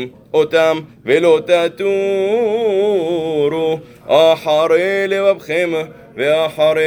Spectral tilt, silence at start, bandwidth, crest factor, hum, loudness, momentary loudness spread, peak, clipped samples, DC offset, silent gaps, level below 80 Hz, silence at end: -5 dB/octave; 0 s; 19.5 kHz; 14 dB; none; -15 LUFS; 7 LU; 0 dBFS; under 0.1%; under 0.1%; none; -60 dBFS; 0 s